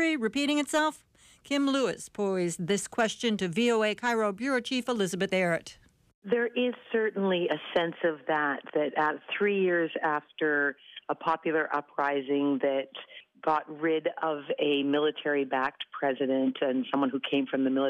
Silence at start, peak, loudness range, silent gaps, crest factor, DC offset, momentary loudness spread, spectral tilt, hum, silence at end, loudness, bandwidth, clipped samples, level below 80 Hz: 0 s; -16 dBFS; 1 LU; 6.14-6.22 s; 14 dB; under 0.1%; 5 LU; -4.5 dB/octave; none; 0 s; -29 LUFS; 14.5 kHz; under 0.1%; -72 dBFS